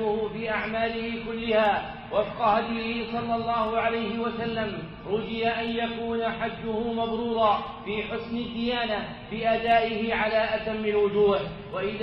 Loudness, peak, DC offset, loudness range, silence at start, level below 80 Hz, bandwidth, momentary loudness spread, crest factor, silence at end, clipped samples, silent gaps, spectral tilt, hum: -27 LUFS; -10 dBFS; under 0.1%; 3 LU; 0 s; -50 dBFS; 5.8 kHz; 8 LU; 18 dB; 0 s; under 0.1%; none; -3 dB/octave; none